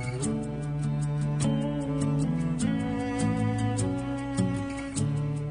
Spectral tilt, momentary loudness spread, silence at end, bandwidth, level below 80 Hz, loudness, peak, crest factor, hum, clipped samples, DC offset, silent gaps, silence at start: -6.5 dB/octave; 4 LU; 0 s; 10 kHz; -46 dBFS; -29 LUFS; -12 dBFS; 16 dB; none; under 0.1%; under 0.1%; none; 0 s